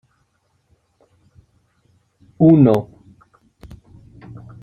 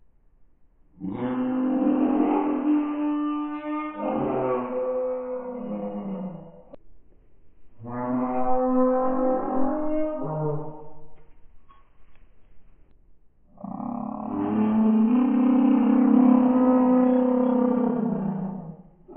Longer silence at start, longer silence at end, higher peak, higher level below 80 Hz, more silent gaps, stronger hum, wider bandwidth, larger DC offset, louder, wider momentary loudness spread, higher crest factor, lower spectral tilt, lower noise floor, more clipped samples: first, 2.4 s vs 1 s; first, 1.8 s vs 0 s; first, -2 dBFS vs -8 dBFS; about the same, -54 dBFS vs -52 dBFS; neither; neither; first, 5.2 kHz vs 3.3 kHz; neither; first, -14 LUFS vs -24 LUFS; first, 29 LU vs 15 LU; about the same, 20 dB vs 16 dB; first, -10.5 dB/octave vs -6 dB/octave; first, -65 dBFS vs -56 dBFS; neither